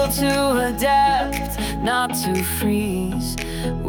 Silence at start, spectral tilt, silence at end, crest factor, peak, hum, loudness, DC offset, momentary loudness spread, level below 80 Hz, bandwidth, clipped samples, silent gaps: 0 s; -4.5 dB/octave; 0 s; 14 dB; -8 dBFS; none; -20 LUFS; under 0.1%; 8 LU; -34 dBFS; over 20 kHz; under 0.1%; none